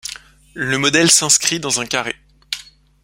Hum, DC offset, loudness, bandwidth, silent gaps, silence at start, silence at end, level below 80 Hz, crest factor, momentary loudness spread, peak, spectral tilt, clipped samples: none; under 0.1%; -14 LUFS; 16.5 kHz; none; 0.05 s; 0.4 s; -52 dBFS; 18 dB; 19 LU; 0 dBFS; -1.5 dB/octave; under 0.1%